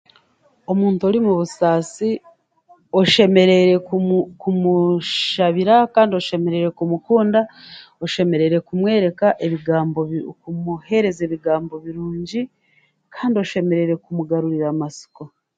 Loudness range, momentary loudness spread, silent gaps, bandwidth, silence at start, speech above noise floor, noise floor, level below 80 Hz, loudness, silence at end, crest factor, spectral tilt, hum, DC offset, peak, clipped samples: 7 LU; 14 LU; none; 9.2 kHz; 0.7 s; 43 dB; -61 dBFS; -60 dBFS; -18 LUFS; 0.3 s; 18 dB; -6.5 dB/octave; none; under 0.1%; 0 dBFS; under 0.1%